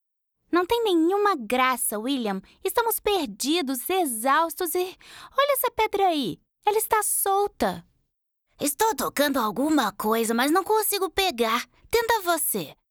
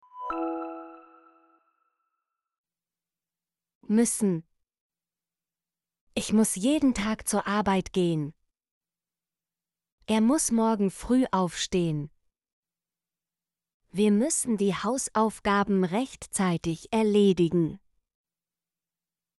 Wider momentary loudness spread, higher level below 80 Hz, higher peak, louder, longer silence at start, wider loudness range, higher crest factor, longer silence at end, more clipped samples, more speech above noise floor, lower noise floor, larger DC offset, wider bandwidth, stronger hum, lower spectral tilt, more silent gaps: second, 7 LU vs 10 LU; about the same, -56 dBFS vs -56 dBFS; first, -8 dBFS vs -12 dBFS; about the same, -24 LUFS vs -26 LUFS; first, 0.5 s vs 0.15 s; second, 2 LU vs 6 LU; about the same, 18 dB vs 16 dB; second, 0.2 s vs 1.6 s; neither; second, 52 dB vs over 65 dB; second, -76 dBFS vs under -90 dBFS; neither; first, over 20 kHz vs 12 kHz; neither; second, -2.5 dB/octave vs -5 dB/octave; second, none vs 2.58-2.64 s, 3.75-3.81 s, 4.81-4.90 s, 6.01-6.07 s, 8.71-8.81 s, 9.92-9.98 s, 12.53-12.63 s, 13.74-13.80 s